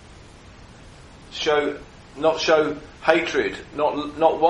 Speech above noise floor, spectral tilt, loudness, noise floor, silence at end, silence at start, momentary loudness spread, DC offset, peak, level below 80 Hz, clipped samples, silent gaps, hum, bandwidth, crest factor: 24 dB; -4 dB/octave; -22 LUFS; -45 dBFS; 0 s; 0.1 s; 10 LU; under 0.1%; -2 dBFS; -50 dBFS; under 0.1%; none; none; 11 kHz; 22 dB